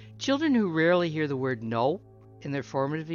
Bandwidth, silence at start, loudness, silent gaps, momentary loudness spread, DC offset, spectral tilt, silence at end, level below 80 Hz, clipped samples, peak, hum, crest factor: 7.2 kHz; 0 s; -27 LUFS; none; 11 LU; under 0.1%; -6 dB/octave; 0 s; -66 dBFS; under 0.1%; -12 dBFS; none; 16 dB